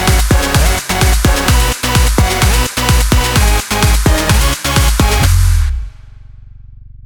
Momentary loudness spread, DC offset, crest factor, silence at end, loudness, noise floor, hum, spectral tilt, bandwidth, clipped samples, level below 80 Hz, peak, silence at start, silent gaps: 2 LU; under 0.1%; 12 dB; 0.05 s; -12 LUFS; -34 dBFS; none; -4 dB/octave; 19 kHz; under 0.1%; -14 dBFS; 0 dBFS; 0 s; none